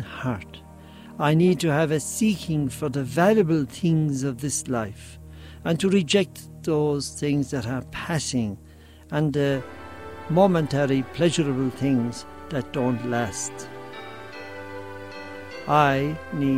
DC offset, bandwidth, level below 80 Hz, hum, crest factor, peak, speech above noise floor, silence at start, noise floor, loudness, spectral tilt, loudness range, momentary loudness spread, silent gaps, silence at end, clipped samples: under 0.1%; 16 kHz; -54 dBFS; none; 20 dB; -4 dBFS; 21 dB; 0 s; -44 dBFS; -24 LUFS; -5.5 dB/octave; 5 LU; 18 LU; none; 0 s; under 0.1%